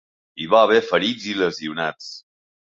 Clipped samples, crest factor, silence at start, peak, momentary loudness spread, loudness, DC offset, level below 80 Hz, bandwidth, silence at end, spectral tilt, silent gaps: under 0.1%; 18 dB; 0.35 s; -2 dBFS; 21 LU; -20 LUFS; under 0.1%; -64 dBFS; 7.6 kHz; 0.5 s; -4 dB/octave; none